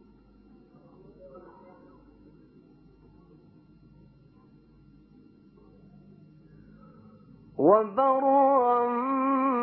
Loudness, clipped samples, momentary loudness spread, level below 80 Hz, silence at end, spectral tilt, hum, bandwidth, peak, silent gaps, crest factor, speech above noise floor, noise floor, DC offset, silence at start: -23 LUFS; under 0.1%; 18 LU; -66 dBFS; 0 s; -11 dB/octave; none; 4.4 kHz; -8 dBFS; none; 22 dB; 34 dB; -57 dBFS; under 0.1%; 1.25 s